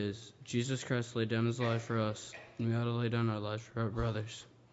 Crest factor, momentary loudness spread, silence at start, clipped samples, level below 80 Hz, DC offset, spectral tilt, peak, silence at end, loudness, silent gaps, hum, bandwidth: 16 dB; 11 LU; 0 s; under 0.1%; -56 dBFS; under 0.1%; -6 dB/octave; -20 dBFS; 0.25 s; -36 LUFS; none; none; 8 kHz